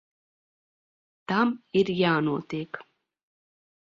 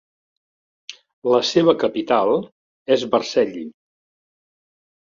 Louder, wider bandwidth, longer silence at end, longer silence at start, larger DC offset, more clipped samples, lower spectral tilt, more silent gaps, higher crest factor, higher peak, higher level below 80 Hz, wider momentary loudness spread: second, -26 LUFS vs -19 LUFS; about the same, 7.4 kHz vs 7.6 kHz; second, 1.15 s vs 1.4 s; first, 1.3 s vs 0.9 s; neither; neither; first, -7 dB/octave vs -5 dB/octave; second, none vs 1.13-1.22 s, 2.52-2.85 s; about the same, 20 dB vs 20 dB; second, -10 dBFS vs -2 dBFS; second, -70 dBFS vs -64 dBFS; second, 16 LU vs 23 LU